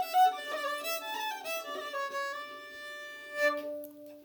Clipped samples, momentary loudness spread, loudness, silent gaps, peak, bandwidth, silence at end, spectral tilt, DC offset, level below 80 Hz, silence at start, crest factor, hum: under 0.1%; 15 LU; -34 LUFS; none; -16 dBFS; over 20 kHz; 0 s; 0 dB/octave; under 0.1%; -84 dBFS; 0 s; 18 dB; none